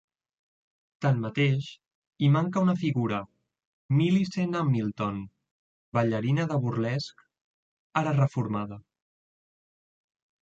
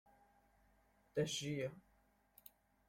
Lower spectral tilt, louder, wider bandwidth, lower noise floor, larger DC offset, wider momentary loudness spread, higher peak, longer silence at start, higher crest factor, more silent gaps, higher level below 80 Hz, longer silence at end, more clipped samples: first, -7.5 dB/octave vs -4.5 dB/octave; first, -27 LUFS vs -43 LUFS; second, 7.6 kHz vs 16.5 kHz; first, under -90 dBFS vs -75 dBFS; neither; second, 12 LU vs 22 LU; first, -12 dBFS vs -26 dBFS; second, 1 s vs 1.15 s; about the same, 18 dB vs 22 dB; first, 1.95-2.11 s, 3.65-3.89 s, 5.51-5.92 s, 7.41-7.90 s vs none; first, -64 dBFS vs -76 dBFS; first, 1.65 s vs 1.1 s; neither